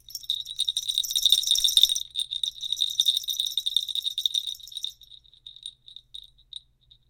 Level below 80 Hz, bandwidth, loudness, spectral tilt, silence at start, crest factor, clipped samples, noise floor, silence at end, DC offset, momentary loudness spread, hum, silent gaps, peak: -62 dBFS; 17 kHz; -23 LUFS; 4.5 dB/octave; 0.1 s; 26 dB; under 0.1%; -60 dBFS; 0.95 s; under 0.1%; 23 LU; 60 Hz at -70 dBFS; none; -2 dBFS